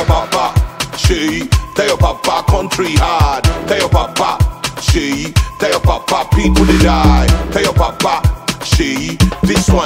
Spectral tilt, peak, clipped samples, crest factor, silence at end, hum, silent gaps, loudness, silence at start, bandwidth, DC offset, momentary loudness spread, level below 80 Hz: -5 dB/octave; 0 dBFS; under 0.1%; 12 dB; 0 s; none; none; -13 LUFS; 0 s; 16.5 kHz; under 0.1%; 5 LU; -18 dBFS